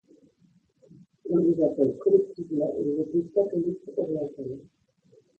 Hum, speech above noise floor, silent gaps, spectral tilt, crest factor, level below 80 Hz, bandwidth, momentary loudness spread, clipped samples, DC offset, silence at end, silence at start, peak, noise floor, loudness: none; 38 dB; none; -11 dB/octave; 20 dB; -68 dBFS; 4.6 kHz; 13 LU; under 0.1%; under 0.1%; 0.8 s; 1.25 s; -8 dBFS; -64 dBFS; -26 LUFS